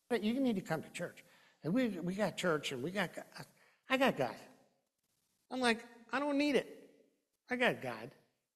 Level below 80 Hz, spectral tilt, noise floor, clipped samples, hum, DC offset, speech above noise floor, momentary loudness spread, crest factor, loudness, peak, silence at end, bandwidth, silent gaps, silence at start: -76 dBFS; -5 dB/octave; -82 dBFS; under 0.1%; none; under 0.1%; 46 dB; 16 LU; 24 dB; -36 LUFS; -14 dBFS; 0.45 s; 14 kHz; none; 0.1 s